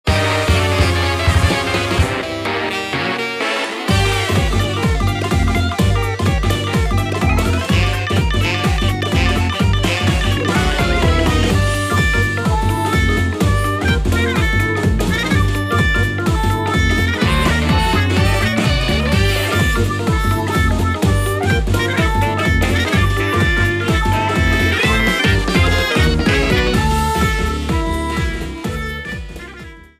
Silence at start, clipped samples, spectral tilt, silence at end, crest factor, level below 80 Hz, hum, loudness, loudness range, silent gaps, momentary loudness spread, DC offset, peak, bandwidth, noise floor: 0.05 s; under 0.1%; -5 dB/octave; 0.15 s; 14 dB; -22 dBFS; none; -16 LUFS; 2 LU; none; 5 LU; under 0.1%; 0 dBFS; 15.5 kHz; -35 dBFS